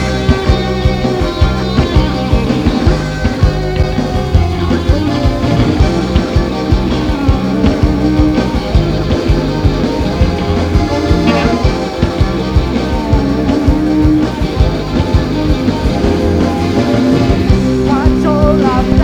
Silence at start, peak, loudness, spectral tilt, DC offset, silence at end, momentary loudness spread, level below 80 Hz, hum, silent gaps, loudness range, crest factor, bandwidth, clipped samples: 0 s; 0 dBFS; -13 LUFS; -7 dB/octave; under 0.1%; 0 s; 3 LU; -18 dBFS; none; none; 1 LU; 12 dB; 13 kHz; 0.2%